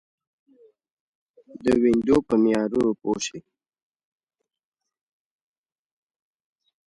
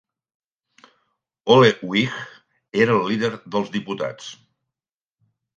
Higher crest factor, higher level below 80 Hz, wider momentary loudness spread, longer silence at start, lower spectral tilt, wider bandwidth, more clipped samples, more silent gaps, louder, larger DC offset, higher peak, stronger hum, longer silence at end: about the same, 20 dB vs 22 dB; first, -56 dBFS vs -66 dBFS; second, 9 LU vs 19 LU; about the same, 1.55 s vs 1.45 s; about the same, -5.5 dB/octave vs -5.5 dB/octave; first, 11.5 kHz vs 7.6 kHz; neither; neither; about the same, -22 LUFS vs -20 LUFS; neither; second, -8 dBFS vs 0 dBFS; neither; first, 3.45 s vs 1.25 s